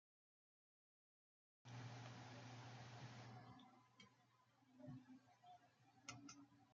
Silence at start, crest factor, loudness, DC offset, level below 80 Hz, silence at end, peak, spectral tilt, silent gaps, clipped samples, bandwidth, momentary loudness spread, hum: 1.65 s; 22 dB; -61 LUFS; under 0.1%; under -90 dBFS; 0 s; -40 dBFS; -4.5 dB/octave; none; under 0.1%; 7.4 kHz; 11 LU; none